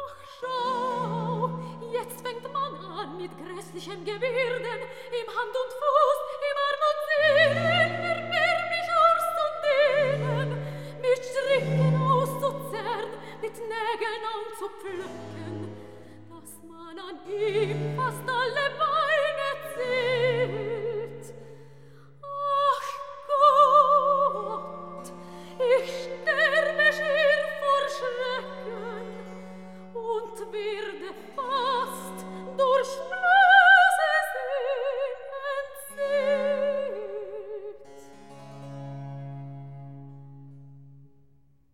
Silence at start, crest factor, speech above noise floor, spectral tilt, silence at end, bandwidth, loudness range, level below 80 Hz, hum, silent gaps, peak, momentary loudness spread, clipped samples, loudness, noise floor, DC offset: 0 s; 22 dB; 35 dB; -5 dB/octave; 0.7 s; 16.5 kHz; 13 LU; -70 dBFS; none; none; -6 dBFS; 19 LU; under 0.1%; -25 LUFS; -63 dBFS; 0.3%